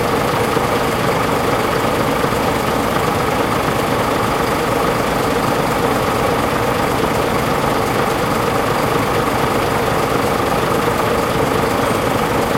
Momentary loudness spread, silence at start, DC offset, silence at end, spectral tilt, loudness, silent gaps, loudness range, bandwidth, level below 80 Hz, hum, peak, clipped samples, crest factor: 1 LU; 0 s; under 0.1%; 0 s; -5 dB/octave; -16 LUFS; none; 0 LU; 16 kHz; -34 dBFS; none; -2 dBFS; under 0.1%; 14 dB